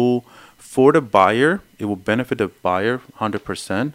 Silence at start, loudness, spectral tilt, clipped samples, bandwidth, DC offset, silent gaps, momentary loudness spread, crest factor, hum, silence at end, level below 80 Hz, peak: 0 s; -19 LUFS; -6 dB/octave; under 0.1%; 16 kHz; under 0.1%; none; 11 LU; 18 dB; none; 0.05 s; -56 dBFS; 0 dBFS